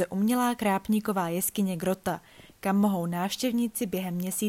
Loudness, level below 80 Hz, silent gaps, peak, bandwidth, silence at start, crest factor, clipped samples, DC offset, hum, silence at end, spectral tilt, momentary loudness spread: -28 LUFS; -62 dBFS; none; -14 dBFS; 16.5 kHz; 0 s; 14 dB; under 0.1%; under 0.1%; none; 0 s; -5 dB/octave; 6 LU